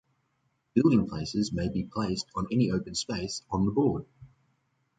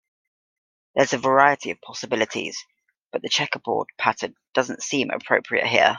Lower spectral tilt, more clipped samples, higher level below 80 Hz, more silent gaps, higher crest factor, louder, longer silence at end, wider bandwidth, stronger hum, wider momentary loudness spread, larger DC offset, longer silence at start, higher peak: first, -6 dB/octave vs -3 dB/octave; neither; first, -52 dBFS vs -68 dBFS; second, none vs 3.06-3.10 s; about the same, 20 dB vs 22 dB; second, -29 LUFS vs -23 LUFS; first, 0.75 s vs 0 s; about the same, 9.4 kHz vs 10 kHz; neither; second, 8 LU vs 14 LU; neither; second, 0.75 s vs 0.95 s; second, -10 dBFS vs 0 dBFS